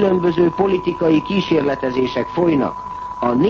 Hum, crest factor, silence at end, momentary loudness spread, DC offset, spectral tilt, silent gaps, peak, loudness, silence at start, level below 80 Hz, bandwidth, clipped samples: none; 12 dB; 0 s; 6 LU; under 0.1%; -8 dB/octave; none; -4 dBFS; -18 LUFS; 0 s; -46 dBFS; 7 kHz; under 0.1%